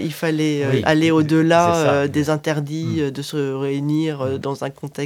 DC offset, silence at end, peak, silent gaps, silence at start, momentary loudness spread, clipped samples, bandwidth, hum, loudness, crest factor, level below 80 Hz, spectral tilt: under 0.1%; 0 s; 0 dBFS; none; 0 s; 9 LU; under 0.1%; 16.5 kHz; none; -19 LUFS; 18 dB; -54 dBFS; -6 dB/octave